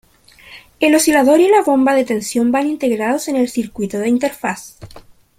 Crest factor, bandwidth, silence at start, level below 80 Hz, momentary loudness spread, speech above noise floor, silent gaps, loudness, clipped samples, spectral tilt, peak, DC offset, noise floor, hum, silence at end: 14 dB; 16.5 kHz; 0.5 s; -52 dBFS; 11 LU; 30 dB; none; -15 LUFS; under 0.1%; -4 dB/octave; -2 dBFS; under 0.1%; -45 dBFS; none; 0.4 s